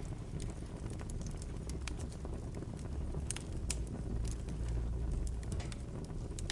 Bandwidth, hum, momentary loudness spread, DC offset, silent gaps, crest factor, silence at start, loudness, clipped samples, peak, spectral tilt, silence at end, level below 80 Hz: 11.5 kHz; none; 5 LU; under 0.1%; none; 22 dB; 0 s; -42 LUFS; under 0.1%; -18 dBFS; -5 dB/octave; 0 s; -42 dBFS